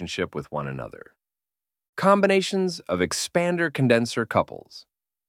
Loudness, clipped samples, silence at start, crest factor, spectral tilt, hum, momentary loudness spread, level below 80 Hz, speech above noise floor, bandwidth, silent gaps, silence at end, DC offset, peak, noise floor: -23 LUFS; under 0.1%; 0 s; 20 dB; -5 dB/octave; none; 15 LU; -58 dBFS; over 66 dB; 16.5 kHz; 1.89-1.93 s; 0.5 s; under 0.1%; -4 dBFS; under -90 dBFS